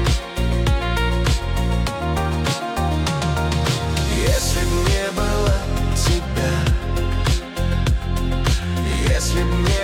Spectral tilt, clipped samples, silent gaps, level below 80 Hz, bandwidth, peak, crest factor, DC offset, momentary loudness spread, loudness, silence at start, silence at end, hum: -5 dB/octave; under 0.1%; none; -22 dBFS; 16.5 kHz; -6 dBFS; 12 dB; under 0.1%; 3 LU; -21 LUFS; 0 s; 0 s; none